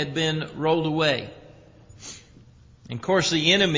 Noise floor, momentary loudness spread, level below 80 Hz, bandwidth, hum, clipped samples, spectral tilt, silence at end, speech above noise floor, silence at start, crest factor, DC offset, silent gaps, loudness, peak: -51 dBFS; 22 LU; -54 dBFS; 7.6 kHz; none; under 0.1%; -4 dB/octave; 0 s; 28 dB; 0 s; 20 dB; under 0.1%; none; -23 LUFS; -6 dBFS